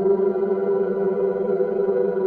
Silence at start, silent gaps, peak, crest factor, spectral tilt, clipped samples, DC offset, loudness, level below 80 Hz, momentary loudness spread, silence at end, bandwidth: 0 s; none; -8 dBFS; 12 dB; -11 dB/octave; under 0.1%; under 0.1%; -22 LUFS; -62 dBFS; 2 LU; 0 s; 3.1 kHz